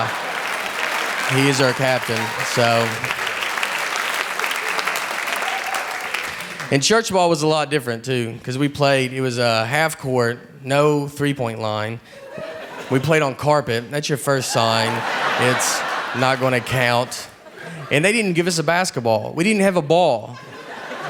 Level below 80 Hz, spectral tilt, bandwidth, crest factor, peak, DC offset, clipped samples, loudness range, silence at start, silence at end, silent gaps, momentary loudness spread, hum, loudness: -58 dBFS; -4 dB/octave; over 20 kHz; 20 dB; 0 dBFS; under 0.1%; under 0.1%; 3 LU; 0 s; 0 s; none; 10 LU; none; -19 LUFS